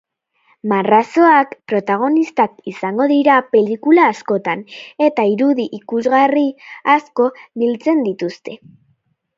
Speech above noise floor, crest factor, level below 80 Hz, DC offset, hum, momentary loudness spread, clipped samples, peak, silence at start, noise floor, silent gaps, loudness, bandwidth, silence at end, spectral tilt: 47 dB; 16 dB; -68 dBFS; under 0.1%; none; 11 LU; under 0.1%; 0 dBFS; 0.65 s; -63 dBFS; none; -15 LUFS; 7.6 kHz; 0.8 s; -6.5 dB/octave